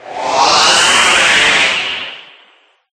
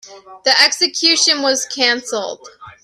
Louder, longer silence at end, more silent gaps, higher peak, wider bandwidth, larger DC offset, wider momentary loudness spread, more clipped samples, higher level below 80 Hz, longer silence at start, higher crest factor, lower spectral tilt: first, -9 LUFS vs -13 LUFS; first, 0.75 s vs 0.1 s; neither; about the same, 0 dBFS vs 0 dBFS; first, over 20 kHz vs 16 kHz; neither; about the same, 11 LU vs 12 LU; neither; first, -48 dBFS vs -66 dBFS; about the same, 0.05 s vs 0.05 s; second, 12 dB vs 18 dB; about the same, 0.5 dB/octave vs 1 dB/octave